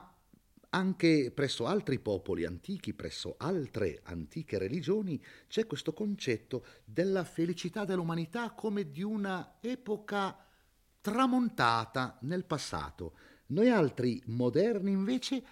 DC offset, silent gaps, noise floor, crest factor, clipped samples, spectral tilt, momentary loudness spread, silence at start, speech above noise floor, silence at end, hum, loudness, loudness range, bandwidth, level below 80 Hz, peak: under 0.1%; none; -69 dBFS; 20 dB; under 0.1%; -6 dB/octave; 11 LU; 0 s; 36 dB; 0 s; none; -33 LUFS; 5 LU; 16 kHz; -64 dBFS; -12 dBFS